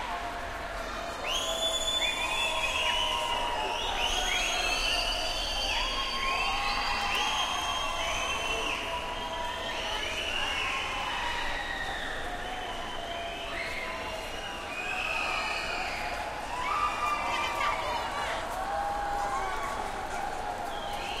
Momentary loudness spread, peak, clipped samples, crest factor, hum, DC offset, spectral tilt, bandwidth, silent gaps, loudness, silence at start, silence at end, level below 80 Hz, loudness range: 8 LU; -16 dBFS; under 0.1%; 16 dB; none; under 0.1%; -1.5 dB/octave; 16 kHz; none; -30 LUFS; 0 s; 0 s; -44 dBFS; 5 LU